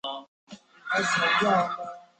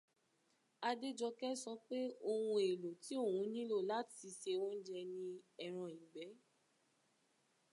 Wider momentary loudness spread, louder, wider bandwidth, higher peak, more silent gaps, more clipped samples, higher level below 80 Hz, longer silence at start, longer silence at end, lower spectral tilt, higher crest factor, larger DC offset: first, 17 LU vs 12 LU; first, -24 LUFS vs -43 LUFS; second, 9.2 kHz vs 11.5 kHz; first, -12 dBFS vs -26 dBFS; first, 0.28-0.47 s vs none; neither; first, -68 dBFS vs under -90 dBFS; second, 0.05 s vs 0.8 s; second, 0.15 s vs 1.35 s; second, -3 dB/octave vs -4.5 dB/octave; about the same, 16 dB vs 18 dB; neither